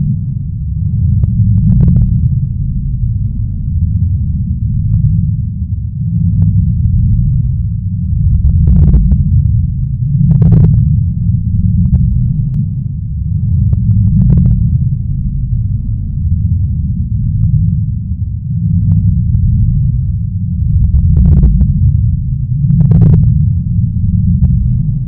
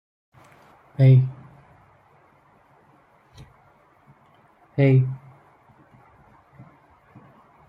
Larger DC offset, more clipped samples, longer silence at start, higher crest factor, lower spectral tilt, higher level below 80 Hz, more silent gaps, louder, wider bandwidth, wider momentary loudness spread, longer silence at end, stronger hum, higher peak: neither; first, 0.5% vs under 0.1%; second, 0 s vs 1 s; second, 10 dB vs 20 dB; first, -14.5 dB/octave vs -10.5 dB/octave; first, -16 dBFS vs -64 dBFS; neither; first, -12 LUFS vs -19 LUFS; second, 1.3 kHz vs 5 kHz; second, 8 LU vs 24 LU; second, 0 s vs 2.5 s; neither; first, 0 dBFS vs -6 dBFS